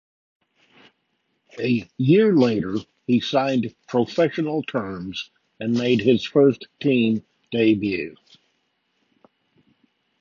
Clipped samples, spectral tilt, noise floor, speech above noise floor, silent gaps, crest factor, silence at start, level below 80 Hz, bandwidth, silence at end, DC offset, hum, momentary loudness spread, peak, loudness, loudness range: under 0.1%; -7 dB/octave; -72 dBFS; 51 dB; none; 18 dB; 1.55 s; -60 dBFS; 7.2 kHz; 2.1 s; under 0.1%; none; 13 LU; -4 dBFS; -21 LUFS; 4 LU